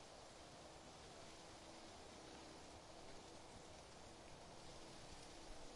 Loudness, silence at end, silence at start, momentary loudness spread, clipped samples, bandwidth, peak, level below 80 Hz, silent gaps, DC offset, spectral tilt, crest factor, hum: -59 LUFS; 0 s; 0 s; 2 LU; under 0.1%; 11.5 kHz; -44 dBFS; -68 dBFS; none; under 0.1%; -3 dB/octave; 14 dB; none